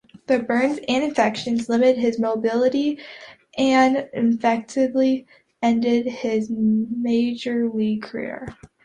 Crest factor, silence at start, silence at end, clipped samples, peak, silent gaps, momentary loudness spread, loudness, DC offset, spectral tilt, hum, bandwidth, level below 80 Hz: 16 dB; 0.3 s; 0.2 s; under 0.1%; -6 dBFS; none; 11 LU; -21 LUFS; under 0.1%; -5.5 dB/octave; none; 9.6 kHz; -60 dBFS